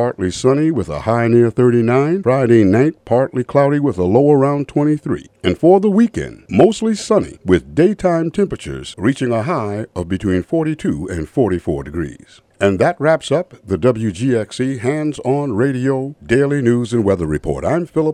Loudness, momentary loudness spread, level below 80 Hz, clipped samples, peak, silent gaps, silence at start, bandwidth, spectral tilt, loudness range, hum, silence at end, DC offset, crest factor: -16 LUFS; 9 LU; -42 dBFS; under 0.1%; 0 dBFS; none; 0 s; 11 kHz; -7 dB/octave; 5 LU; none; 0 s; under 0.1%; 16 dB